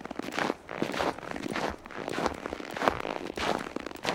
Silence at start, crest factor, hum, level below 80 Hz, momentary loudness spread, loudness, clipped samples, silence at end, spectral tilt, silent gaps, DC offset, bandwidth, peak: 0 s; 30 dB; none; -56 dBFS; 8 LU; -33 LUFS; under 0.1%; 0 s; -4 dB/octave; none; under 0.1%; 18 kHz; -4 dBFS